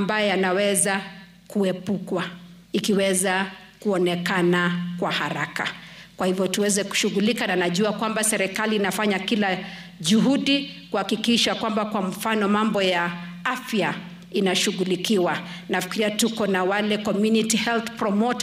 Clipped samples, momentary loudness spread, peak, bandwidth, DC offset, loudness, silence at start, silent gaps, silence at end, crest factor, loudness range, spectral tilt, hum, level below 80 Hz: under 0.1%; 8 LU; -8 dBFS; 16 kHz; under 0.1%; -23 LUFS; 0 s; none; 0 s; 14 dB; 2 LU; -4 dB/octave; none; -62 dBFS